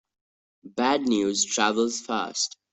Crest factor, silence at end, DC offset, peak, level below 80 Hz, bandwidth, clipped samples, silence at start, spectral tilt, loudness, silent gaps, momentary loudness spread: 18 dB; 0.25 s; under 0.1%; -8 dBFS; -66 dBFS; 8.4 kHz; under 0.1%; 0.65 s; -2 dB/octave; -25 LUFS; none; 6 LU